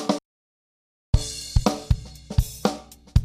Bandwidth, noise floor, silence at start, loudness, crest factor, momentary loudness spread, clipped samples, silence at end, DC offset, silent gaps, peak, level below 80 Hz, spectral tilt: 15.5 kHz; under -90 dBFS; 0 s; -26 LUFS; 22 dB; 4 LU; under 0.1%; 0 s; under 0.1%; 0.25-1.13 s; -4 dBFS; -28 dBFS; -5.5 dB/octave